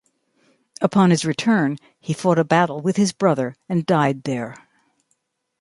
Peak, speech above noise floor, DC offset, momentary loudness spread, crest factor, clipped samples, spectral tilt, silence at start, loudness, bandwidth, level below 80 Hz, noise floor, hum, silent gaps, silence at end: -2 dBFS; 52 dB; under 0.1%; 10 LU; 18 dB; under 0.1%; -6 dB/octave; 0.8 s; -20 LUFS; 11.5 kHz; -64 dBFS; -71 dBFS; none; none; 1.05 s